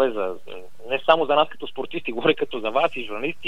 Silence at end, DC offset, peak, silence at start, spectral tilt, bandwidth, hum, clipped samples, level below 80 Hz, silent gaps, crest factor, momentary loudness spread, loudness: 0 s; 2%; -2 dBFS; 0 s; -5.5 dB/octave; 12 kHz; none; under 0.1%; -66 dBFS; none; 20 dB; 14 LU; -23 LUFS